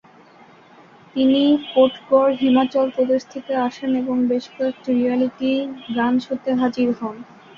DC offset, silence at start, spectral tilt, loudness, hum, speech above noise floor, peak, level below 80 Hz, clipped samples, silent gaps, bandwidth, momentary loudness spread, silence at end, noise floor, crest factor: under 0.1%; 1.15 s; -6 dB/octave; -20 LUFS; none; 29 dB; -4 dBFS; -62 dBFS; under 0.1%; none; 7 kHz; 9 LU; 0.35 s; -48 dBFS; 16 dB